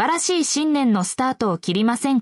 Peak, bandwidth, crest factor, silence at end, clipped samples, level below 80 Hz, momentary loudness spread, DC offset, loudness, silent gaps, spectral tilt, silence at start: -8 dBFS; 12 kHz; 12 dB; 0 s; under 0.1%; -64 dBFS; 3 LU; under 0.1%; -20 LUFS; none; -4 dB/octave; 0 s